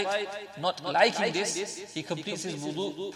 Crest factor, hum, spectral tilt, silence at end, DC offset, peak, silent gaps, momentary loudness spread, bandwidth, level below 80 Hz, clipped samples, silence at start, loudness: 22 dB; none; -3 dB/octave; 0 s; under 0.1%; -8 dBFS; none; 11 LU; 16 kHz; -76 dBFS; under 0.1%; 0 s; -30 LUFS